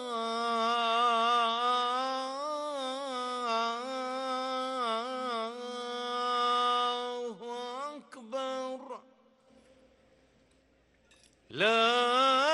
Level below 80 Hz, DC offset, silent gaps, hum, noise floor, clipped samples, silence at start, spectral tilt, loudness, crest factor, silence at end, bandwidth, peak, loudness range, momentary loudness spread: -80 dBFS; under 0.1%; none; none; -67 dBFS; under 0.1%; 0 s; -2 dB/octave; -31 LUFS; 18 dB; 0 s; 12 kHz; -14 dBFS; 12 LU; 14 LU